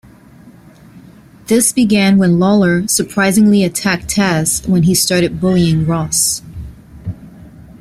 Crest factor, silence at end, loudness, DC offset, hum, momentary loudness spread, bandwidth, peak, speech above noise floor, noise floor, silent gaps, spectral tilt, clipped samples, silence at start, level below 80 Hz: 12 dB; 0.2 s; -12 LUFS; under 0.1%; none; 18 LU; 15.5 kHz; -2 dBFS; 28 dB; -41 dBFS; none; -4.5 dB/octave; under 0.1%; 0.45 s; -40 dBFS